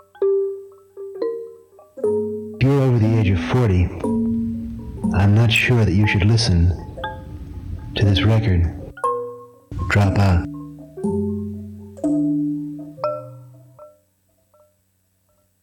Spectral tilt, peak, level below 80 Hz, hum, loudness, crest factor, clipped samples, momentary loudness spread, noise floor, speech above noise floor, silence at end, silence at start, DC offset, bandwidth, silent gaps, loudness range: -7 dB/octave; -6 dBFS; -38 dBFS; none; -20 LUFS; 14 dB; under 0.1%; 18 LU; -65 dBFS; 49 dB; 1.75 s; 0.2 s; under 0.1%; 12.5 kHz; none; 8 LU